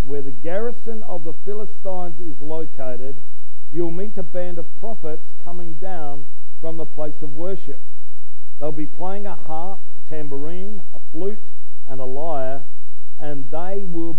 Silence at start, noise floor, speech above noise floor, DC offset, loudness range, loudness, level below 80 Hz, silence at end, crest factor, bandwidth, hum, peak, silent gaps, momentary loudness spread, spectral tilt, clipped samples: 0 s; -58 dBFS; 27 dB; 50%; 3 LU; -32 LUFS; -60 dBFS; 0 s; 18 dB; 9.8 kHz; 60 Hz at -60 dBFS; -4 dBFS; none; 11 LU; -10 dB/octave; under 0.1%